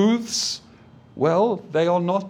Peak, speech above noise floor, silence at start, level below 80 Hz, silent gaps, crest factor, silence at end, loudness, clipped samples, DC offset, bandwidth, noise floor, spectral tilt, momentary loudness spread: -6 dBFS; 28 dB; 0 s; -64 dBFS; none; 16 dB; 0 s; -22 LUFS; under 0.1%; under 0.1%; 15.5 kHz; -49 dBFS; -4.5 dB/octave; 6 LU